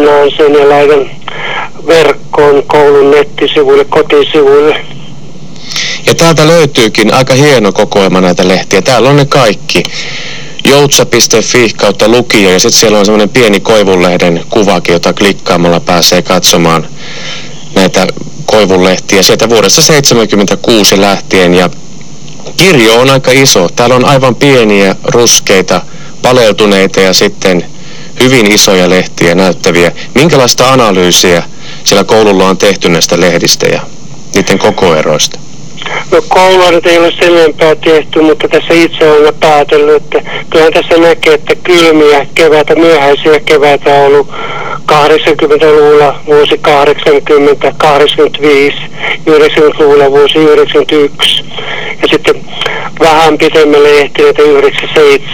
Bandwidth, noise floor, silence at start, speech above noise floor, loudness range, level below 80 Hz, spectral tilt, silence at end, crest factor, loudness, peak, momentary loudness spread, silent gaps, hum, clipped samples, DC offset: 19.5 kHz; -27 dBFS; 0 s; 22 dB; 2 LU; -36 dBFS; -3.5 dB/octave; 0 s; 6 dB; -5 LUFS; 0 dBFS; 9 LU; none; none; 8%; 10%